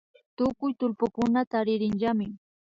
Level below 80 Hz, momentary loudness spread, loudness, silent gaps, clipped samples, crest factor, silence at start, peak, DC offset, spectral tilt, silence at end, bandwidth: -60 dBFS; 4 LU; -28 LUFS; 1.47-1.51 s; under 0.1%; 16 dB; 0.4 s; -12 dBFS; under 0.1%; -7.5 dB/octave; 0.45 s; 7.6 kHz